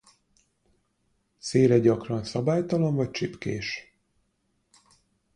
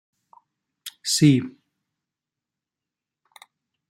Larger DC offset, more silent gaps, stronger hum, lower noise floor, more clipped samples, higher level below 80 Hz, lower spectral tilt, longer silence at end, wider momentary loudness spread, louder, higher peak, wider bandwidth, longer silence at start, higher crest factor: neither; neither; neither; second, -73 dBFS vs -88 dBFS; neither; about the same, -60 dBFS vs -64 dBFS; first, -6.5 dB/octave vs -5 dB/octave; second, 1.55 s vs 2.4 s; second, 13 LU vs 23 LU; second, -25 LUFS vs -20 LUFS; second, -8 dBFS vs -4 dBFS; second, 10.5 kHz vs 16 kHz; first, 1.45 s vs 0.85 s; about the same, 20 dB vs 22 dB